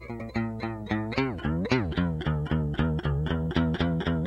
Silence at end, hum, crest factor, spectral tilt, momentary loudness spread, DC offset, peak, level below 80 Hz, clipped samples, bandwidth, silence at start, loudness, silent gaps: 0 s; none; 18 dB; -8 dB/octave; 5 LU; under 0.1%; -8 dBFS; -38 dBFS; under 0.1%; 7.2 kHz; 0 s; -29 LUFS; none